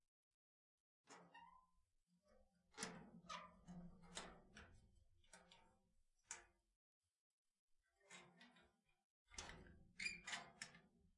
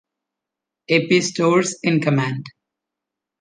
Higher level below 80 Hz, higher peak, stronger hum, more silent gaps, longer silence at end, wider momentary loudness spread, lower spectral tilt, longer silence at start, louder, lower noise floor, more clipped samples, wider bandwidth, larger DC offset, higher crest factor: second, -78 dBFS vs -66 dBFS; second, -34 dBFS vs -4 dBFS; neither; first, 6.76-7.01 s, 7.18-7.45 s, 7.59-7.68 s, 9.04-9.26 s vs none; second, 0.05 s vs 0.9 s; first, 18 LU vs 6 LU; second, -2 dB/octave vs -5 dB/octave; first, 1.05 s vs 0.9 s; second, -56 LUFS vs -18 LUFS; about the same, -83 dBFS vs -85 dBFS; neither; about the same, 11 kHz vs 10 kHz; neither; first, 28 dB vs 18 dB